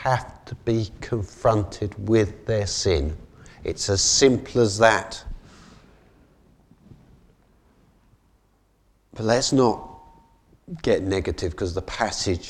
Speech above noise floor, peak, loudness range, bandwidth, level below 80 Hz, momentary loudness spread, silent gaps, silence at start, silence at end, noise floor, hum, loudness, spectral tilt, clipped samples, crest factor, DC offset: 40 dB; -2 dBFS; 6 LU; 12.5 kHz; -42 dBFS; 16 LU; none; 0 s; 0 s; -63 dBFS; none; -23 LUFS; -4 dB/octave; under 0.1%; 24 dB; under 0.1%